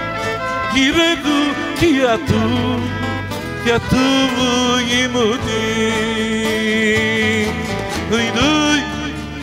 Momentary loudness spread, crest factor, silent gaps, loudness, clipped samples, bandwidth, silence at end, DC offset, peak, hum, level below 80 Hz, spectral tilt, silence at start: 8 LU; 14 dB; none; -16 LUFS; under 0.1%; 16 kHz; 0 s; under 0.1%; -2 dBFS; none; -38 dBFS; -4 dB/octave; 0 s